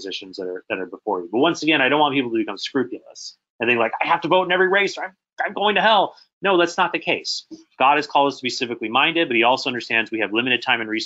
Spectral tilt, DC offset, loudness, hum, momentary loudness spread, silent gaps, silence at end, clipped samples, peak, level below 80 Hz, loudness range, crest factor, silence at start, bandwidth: -3.5 dB/octave; under 0.1%; -20 LUFS; none; 12 LU; 3.50-3.59 s, 6.33-6.41 s; 0 s; under 0.1%; -2 dBFS; -72 dBFS; 2 LU; 18 dB; 0 s; 8 kHz